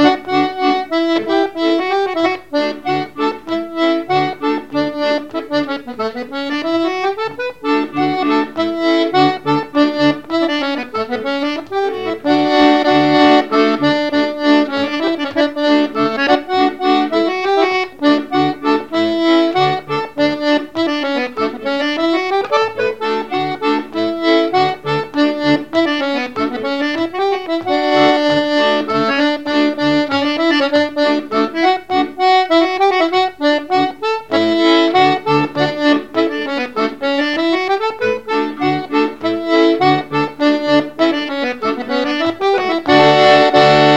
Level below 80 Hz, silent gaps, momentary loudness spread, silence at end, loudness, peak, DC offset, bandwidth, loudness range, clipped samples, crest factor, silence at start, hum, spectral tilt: -54 dBFS; none; 8 LU; 0 s; -15 LUFS; 0 dBFS; 0.7%; 8.4 kHz; 4 LU; under 0.1%; 14 dB; 0 s; none; -5.5 dB/octave